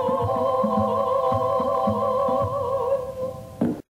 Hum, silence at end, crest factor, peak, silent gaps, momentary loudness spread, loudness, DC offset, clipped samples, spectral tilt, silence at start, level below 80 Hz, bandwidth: none; 0.1 s; 14 dB; -8 dBFS; none; 5 LU; -23 LUFS; under 0.1%; under 0.1%; -8 dB/octave; 0 s; -52 dBFS; 15.5 kHz